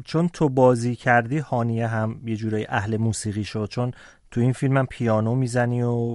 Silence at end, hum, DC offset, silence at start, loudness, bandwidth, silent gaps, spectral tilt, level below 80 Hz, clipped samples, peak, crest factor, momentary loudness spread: 0 s; none; under 0.1%; 0 s; -23 LUFS; 11.5 kHz; none; -7 dB/octave; -52 dBFS; under 0.1%; -4 dBFS; 18 dB; 9 LU